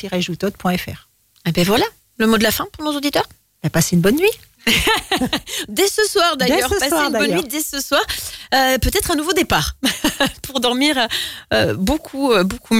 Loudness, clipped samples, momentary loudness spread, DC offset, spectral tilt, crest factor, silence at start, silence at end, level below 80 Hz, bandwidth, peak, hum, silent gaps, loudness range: -17 LUFS; under 0.1%; 7 LU; under 0.1%; -3.5 dB/octave; 14 dB; 0 s; 0 s; -36 dBFS; 16.5 kHz; -4 dBFS; none; none; 2 LU